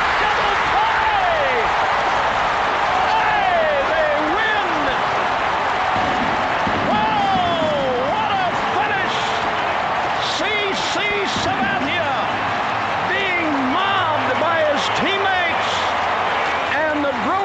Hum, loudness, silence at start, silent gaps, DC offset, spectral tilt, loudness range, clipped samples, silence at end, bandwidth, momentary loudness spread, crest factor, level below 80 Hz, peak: none; -18 LUFS; 0 s; none; under 0.1%; -4 dB/octave; 2 LU; under 0.1%; 0 s; 9.2 kHz; 3 LU; 12 dB; -46 dBFS; -6 dBFS